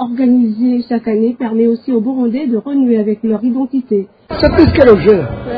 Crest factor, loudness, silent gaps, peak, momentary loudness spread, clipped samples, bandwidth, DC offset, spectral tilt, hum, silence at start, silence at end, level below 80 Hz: 12 dB; -13 LUFS; none; 0 dBFS; 9 LU; 0.5%; 5.2 kHz; under 0.1%; -10 dB/octave; none; 0 s; 0 s; -34 dBFS